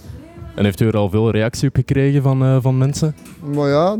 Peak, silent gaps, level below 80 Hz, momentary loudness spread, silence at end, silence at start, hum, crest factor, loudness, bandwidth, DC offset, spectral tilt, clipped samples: -2 dBFS; none; -42 dBFS; 13 LU; 0 s; 0.05 s; none; 14 dB; -17 LUFS; 14.5 kHz; under 0.1%; -7 dB/octave; under 0.1%